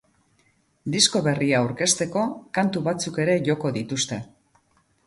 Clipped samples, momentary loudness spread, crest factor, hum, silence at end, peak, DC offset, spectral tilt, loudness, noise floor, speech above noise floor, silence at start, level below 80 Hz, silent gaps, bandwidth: under 0.1%; 8 LU; 22 dB; none; 0.8 s; -4 dBFS; under 0.1%; -3.5 dB/octave; -23 LUFS; -65 dBFS; 41 dB; 0.85 s; -62 dBFS; none; 11.5 kHz